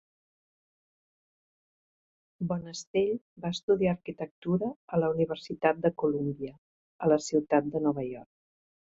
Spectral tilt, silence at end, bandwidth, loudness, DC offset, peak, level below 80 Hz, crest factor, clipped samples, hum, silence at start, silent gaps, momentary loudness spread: -6.5 dB/octave; 0.6 s; 8 kHz; -30 LUFS; under 0.1%; -10 dBFS; -64 dBFS; 22 dB; under 0.1%; none; 2.4 s; 2.87-2.94 s, 3.21-3.36 s, 3.63-3.68 s, 4.31-4.42 s, 4.76-4.88 s, 6.58-6.99 s; 11 LU